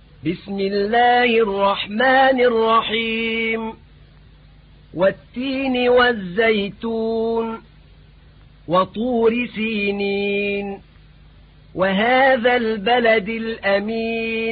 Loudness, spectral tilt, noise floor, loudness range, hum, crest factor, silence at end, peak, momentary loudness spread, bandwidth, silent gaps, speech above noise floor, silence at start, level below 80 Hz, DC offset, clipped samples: -18 LUFS; -10 dB/octave; -47 dBFS; 5 LU; none; 14 dB; 0 s; -4 dBFS; 11 LU; 5 kHz; none; 28 dB; 0.25 s; -48 dBFS; under 0.1%; under 0.1%